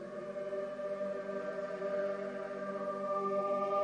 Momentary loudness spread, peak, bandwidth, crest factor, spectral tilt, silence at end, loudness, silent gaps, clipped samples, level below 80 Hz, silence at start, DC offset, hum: 7 LU; -22 dBFS; 9.4 kHz; 14 dB; -6.5 dB/octave; 0 s; -38 LUFS; none; under 0.1%; -76 dBFS; 0 s; under 0.1%; 50 Hz at -65 dBFS